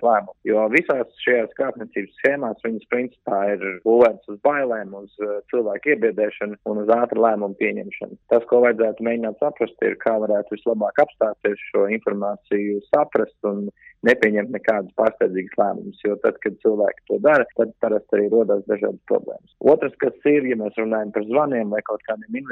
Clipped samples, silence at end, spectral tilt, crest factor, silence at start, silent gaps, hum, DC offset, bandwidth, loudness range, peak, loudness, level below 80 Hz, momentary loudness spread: under 0.1%; 0 s; -7.5 dB/octave; 16 dB; 0 s; none; none; under 0.1%; 7 kHz; 2 LU; -4 dBFS; -21 LUFS; -66 dBFS; 9 LU